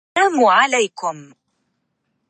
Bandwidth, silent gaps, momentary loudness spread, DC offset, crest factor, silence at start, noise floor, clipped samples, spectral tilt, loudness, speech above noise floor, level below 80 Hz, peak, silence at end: 8.8 kHz; none; 14 LU; under 0.1%; 16 dB; 0.15 s; -71 dBFS; under 0.1%; -2 dB/octave; -16 LUFS; 55 dB; -72 dBFS; -2 dBFS; 1.05 s